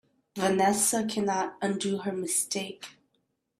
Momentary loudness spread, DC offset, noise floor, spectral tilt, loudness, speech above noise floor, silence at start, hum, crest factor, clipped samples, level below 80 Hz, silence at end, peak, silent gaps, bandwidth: 16 LU; under 0.1%; -76 dBFS; -3.5 dB/octave; -28 LUFS; 48 dB; 0.35 s; none; 18 dB; under 0.1%; -70 dBFS; 0.7 s; -12 dBFS; none; 15.5 kHz